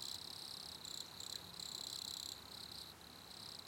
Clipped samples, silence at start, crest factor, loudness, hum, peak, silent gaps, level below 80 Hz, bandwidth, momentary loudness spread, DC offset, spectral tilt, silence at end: under 0.1%; 0 s; 20 dB; -47 LUFS; none; -30 dBFS; none; -76 dBFS; 17 kHz; 7 LU; under 0.1%; -1 dB/octave; 0 s